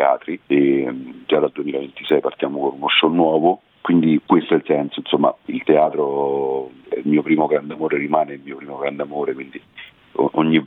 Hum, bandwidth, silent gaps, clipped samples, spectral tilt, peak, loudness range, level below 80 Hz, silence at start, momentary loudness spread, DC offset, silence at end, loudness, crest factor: none; 4.1 kHz; none; under 0.1%; -9 dB/octave; -2 dBFS; 4 LU; -66 dBFS; 0 s; 11 LU; under 0.1%; 0 s; -19 LUFS; 16 dB